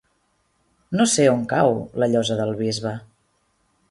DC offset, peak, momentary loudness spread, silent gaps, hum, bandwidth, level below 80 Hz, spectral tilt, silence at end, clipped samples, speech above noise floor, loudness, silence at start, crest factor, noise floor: under 0.1%; -4 dBFS; 11 LU; none; none; 11.5 kHz; -58 dBFS; -4.5 dB/octave; 0.9 s; under 0.1%; 47 dB; -21 LUFS; 0.9 s; 18 dB; -67 dBFS